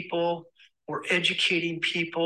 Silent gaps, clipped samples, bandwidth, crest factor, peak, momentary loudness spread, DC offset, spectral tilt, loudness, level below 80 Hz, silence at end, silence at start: none; under 0.1%; 12 kHz; 18 dB; -10 dBFS; 13 LU; under 0.1%; -3.5 dB/octave; -26 LUFS; -76 dBFS; 0 s; 0 s